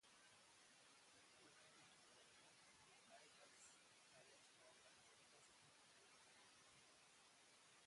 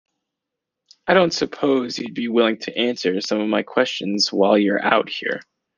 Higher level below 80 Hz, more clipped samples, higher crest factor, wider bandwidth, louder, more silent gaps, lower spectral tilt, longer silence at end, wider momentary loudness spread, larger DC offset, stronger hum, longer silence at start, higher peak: second, under -90 dBFS vs -64 dBFS; neither; about the same, 18 dB vs 18 dB; first, 11.5 kHz vs 9.8 kHz; second, -68 LUFS vs -20 LUFS; neither; second, -1 dB/octave vs -4.5 dB/octave; second, 0 s vs 0.35 s; second, 2 LU vs 9 LU; neither; neither; second, 0 s vs 1.05 s; second, -54 dBFS vs -2 dBFS